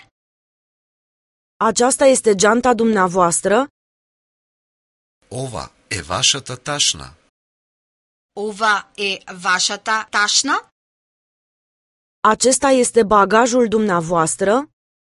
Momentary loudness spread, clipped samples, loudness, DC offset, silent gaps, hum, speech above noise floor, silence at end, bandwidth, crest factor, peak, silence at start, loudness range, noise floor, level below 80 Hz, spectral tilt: 14 LU; under 0.1%; -16 LUFS; under 0.1%; 3.70-5.21 s, 7.29-8.29 s, 10.72-12.22 s; none; over 74 dB; 0.45 s; 12 kHz; 18 dB; 0 dBFS; 1.6 s; 6 LU; under -90 dBFS; -50 dBFS; -2.5 dB/octave